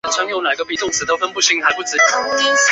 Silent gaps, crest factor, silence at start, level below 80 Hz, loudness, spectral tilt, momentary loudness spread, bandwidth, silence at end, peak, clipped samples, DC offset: none; 16 dB; 0.05 s; -58 dBFS; -16 LUFS; 0.5 dB/octave; 5 LU; 8.4 kHz; 0 s; -2 dBFS; under 0.1%; under 0.1%